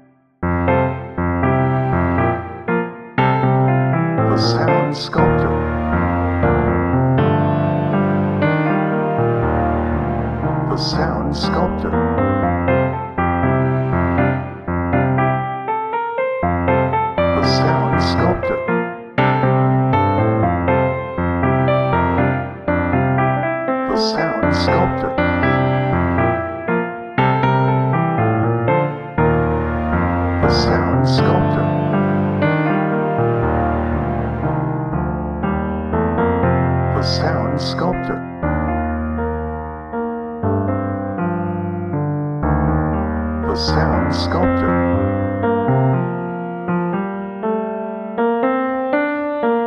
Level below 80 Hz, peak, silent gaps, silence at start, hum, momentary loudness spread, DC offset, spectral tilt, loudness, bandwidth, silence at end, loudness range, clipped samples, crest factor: -32 dBFS; -2 dBFS; none; 0.4 s; none; 6 LU; under 0.1%; -8 dB/octave; -18 LUFS; 7.2 kHz; 0 s; 4 LU; under 0.1%; 16 dB